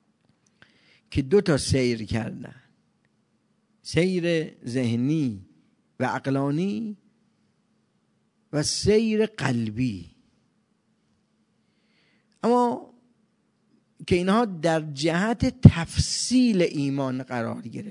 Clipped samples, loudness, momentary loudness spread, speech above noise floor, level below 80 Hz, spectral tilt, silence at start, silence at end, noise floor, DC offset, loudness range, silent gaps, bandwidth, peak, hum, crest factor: under 0.1%; -24 LUFS; 12 LU; 46 dB; -48 dBFS; -6 dB/octave; 1.1 s; 0 s; -69 dBFS; under 0.1%; 9 LU; none; 11 kHz; 0 dBFS; none; 24 dB